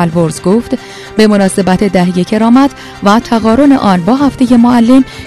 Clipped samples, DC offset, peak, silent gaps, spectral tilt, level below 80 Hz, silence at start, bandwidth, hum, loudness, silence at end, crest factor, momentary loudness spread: 2%; under 0.1%; 0 dBFS; none; -6.5 dB/octave; -36 dBFS; 0 s; 13 kHz; none; -9 LUFS; 0 s; 8 dB; 6 LU